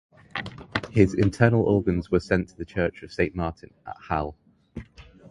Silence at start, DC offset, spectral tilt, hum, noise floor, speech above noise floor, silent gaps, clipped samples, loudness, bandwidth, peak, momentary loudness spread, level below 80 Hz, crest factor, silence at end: 0.35 s; under 0.1%; -7.5 dB/octave; none; -47 dBFS; 24 dB; none; under 0.1%; -25 LUFS; 11.5 kHz; -2 dBFS; 21 LU; -44 dBFS; 22 dB; 0 s